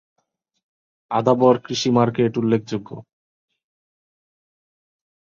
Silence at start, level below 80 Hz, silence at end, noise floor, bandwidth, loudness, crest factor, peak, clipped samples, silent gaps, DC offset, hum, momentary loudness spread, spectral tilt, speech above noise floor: 1.1 s; -62 dBFS; 2.2 s; under -90 dBFS; 7.6 kHz; -19 LUFS; 20 dB; -4 dBFS; under 0.1%; none; under 0.1%; none; 14 LU; -6 dB/octave; over 71 dB